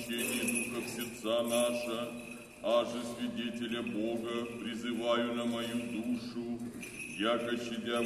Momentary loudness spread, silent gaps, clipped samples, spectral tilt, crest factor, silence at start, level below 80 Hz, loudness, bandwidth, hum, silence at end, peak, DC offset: 9 LU; none; under 0.1%; -3.5 dB/octave; 18 dB; 0 s; -68 dBFS; -35 LUFS; 13.5 kHz; none; 0 s; -18 dBFS; under 0.1%